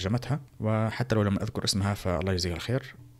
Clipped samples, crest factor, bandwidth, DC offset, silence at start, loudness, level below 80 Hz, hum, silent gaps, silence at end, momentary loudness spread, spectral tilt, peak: under 0.1%; 16 dB; 14.5 kHz; under 0.1%; 0 s; -29 LUFS; -48 dBFS; none; none; 0.1 s; 5 LU; -5.5 dB/octave; -12 dBFS